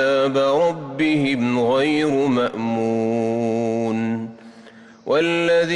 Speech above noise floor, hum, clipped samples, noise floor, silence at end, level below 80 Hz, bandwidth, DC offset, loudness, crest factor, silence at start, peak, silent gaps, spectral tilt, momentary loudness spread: 25 dB; none; under 0.1%; -44 dBFS; 0 s; -60 dBFS; 11 kHz; under 0.1%; -20 LUFS; 10 dB; 0 s; -10 dBFS; none; -6 dB/octave; 5 LU